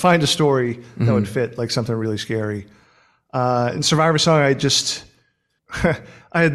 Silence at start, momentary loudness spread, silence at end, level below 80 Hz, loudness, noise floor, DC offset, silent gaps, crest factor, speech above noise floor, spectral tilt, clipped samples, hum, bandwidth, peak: 0 s; 11 LU; 0 s; -48 dBFS; -19 LUFS; -66 dBFS; under 0.1%; none; 16 dB; 47 dB; -4.5 dB/octave; under 0.1%; none; 13.5 kHz; -2 dBFS